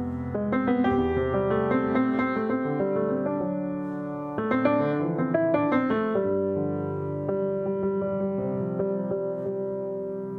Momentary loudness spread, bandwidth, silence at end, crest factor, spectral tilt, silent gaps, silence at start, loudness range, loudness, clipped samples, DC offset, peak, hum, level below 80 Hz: 7 LU; 4.6 kHz; 0 s; 18 dB; -10 dB/octave; none; 0 s; 3 LU; -26 LUFS; under 0.1%; under 0.1%; -8 dBFS; none; -52 dBFS